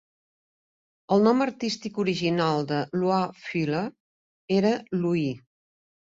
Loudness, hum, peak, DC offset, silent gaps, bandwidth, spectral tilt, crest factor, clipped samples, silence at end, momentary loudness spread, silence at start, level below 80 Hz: -25 LUFS; none; -8 dBFS; under 0.1%; 4.00-4.48 s; 7.8 kHz; -6.5 dB/octave; 18 dB; under 0.1%; 0.65 s; 8 LU; 1.1 s; -66 dBFS